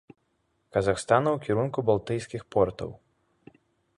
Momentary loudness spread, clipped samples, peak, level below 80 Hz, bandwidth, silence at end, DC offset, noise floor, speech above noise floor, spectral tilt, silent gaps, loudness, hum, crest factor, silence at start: 9 LU; under 0.1%; -6 dBFS; -54 dBFS; 11.5 kHz; 1 s; under 0.1%; -73 dBFS; 47 dB; -6.5 dB/octave; none; -27 LUFS; none; 22 dB; 0.75 s